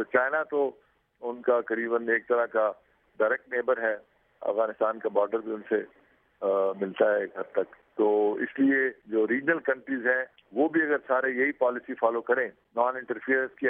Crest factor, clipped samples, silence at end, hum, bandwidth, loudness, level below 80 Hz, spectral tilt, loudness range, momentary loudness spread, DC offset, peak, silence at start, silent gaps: 18 dB; under 0.1%; 0 s; none; 3.7 kHz; -27 LUFS; -78 dBFS; -9 dB/octave; 3 LU; 7 LU; under 0.1%; -10 dBFS; 0 s; none